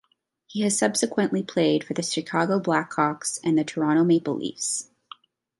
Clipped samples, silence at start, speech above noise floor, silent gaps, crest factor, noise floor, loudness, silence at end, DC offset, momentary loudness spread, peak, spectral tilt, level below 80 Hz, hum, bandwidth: under 0.1%; 0.5 s; 34 dB; none; 18 dB; -58 dBFS; -24 LUFS; 0.75 s; under 0.1%; 6 LU; -6 dBFS; -4 dB/octave; -72 dBFS; none; 11.5 kHz